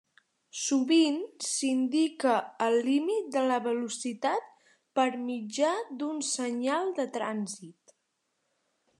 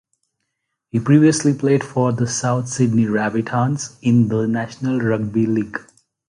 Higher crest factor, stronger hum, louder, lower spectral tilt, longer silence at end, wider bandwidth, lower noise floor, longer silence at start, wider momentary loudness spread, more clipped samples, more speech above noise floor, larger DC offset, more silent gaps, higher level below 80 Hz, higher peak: about the same, 18 dB vs 16 dB; neither; second, -29 LUFS vs -18 LUFS; second, -3 dB/octave vs -6.5 dB/octave; first, 1.3 s vs 0.5 s; about the same, 12 kHz vs 11.5 kHz; about the same, -79 dBFS vs -76 dBFS; second, 0.55 s vs 0.95 s; about the same, 9 LU vs 8 LU; neither; second, 50 dB vs 59 dB; neither; neither; second, under -90 dBFS vs -54 dBFS; second, -12 dBFS vs -2 dBFS